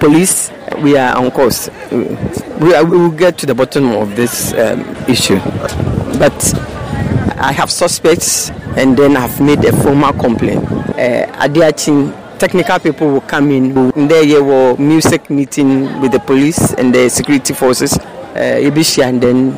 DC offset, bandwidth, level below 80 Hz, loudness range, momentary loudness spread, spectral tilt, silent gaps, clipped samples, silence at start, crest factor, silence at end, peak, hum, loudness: 0.6%; 16 kHz; -36 dBFS; 3 LU; 8 LU; -4.5 dB/octave; none; under 0.1%; 0 s; 10 dB; 0 s; -2 dBFS; none; -11 LUFS